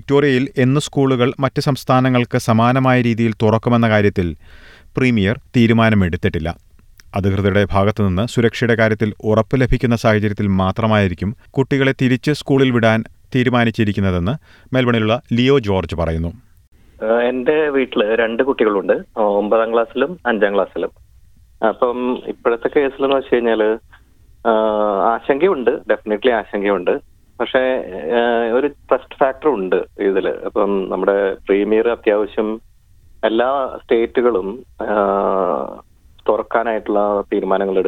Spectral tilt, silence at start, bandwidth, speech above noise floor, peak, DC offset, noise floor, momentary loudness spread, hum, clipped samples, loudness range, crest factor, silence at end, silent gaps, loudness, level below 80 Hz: -7 dB/octave; 0.1 s; 14 kHz; 31 dB; -2 dBFS; under 0.1%; -47 dBFS; 7 LU; none; under 0.1%; 3 LU; 16 dB; 0 s; 16.68-16.72 s; -17 LUFS; -40 dBFS